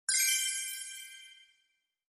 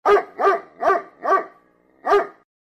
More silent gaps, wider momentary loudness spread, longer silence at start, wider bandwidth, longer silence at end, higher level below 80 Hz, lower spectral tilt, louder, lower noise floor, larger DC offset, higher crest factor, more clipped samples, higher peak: neither; first, 21 LU vs 12 LU; about the same, 0.1 s vs 0.05 s; first, 18 kHz vs 8.8 kHz; first, 0.8 s vs 0.35 s; second, under -90 dBFS vs -60 dBFS; second, 8.5 dB/octave vs -4 dB/octave; second, -30 LUFS vs -20 LUFS; first, -78 dBFS vs -57 dBFS; neither; about the same, 18 dB vs 16 dB; neither; second, -18 dBFS vs -6 dBFS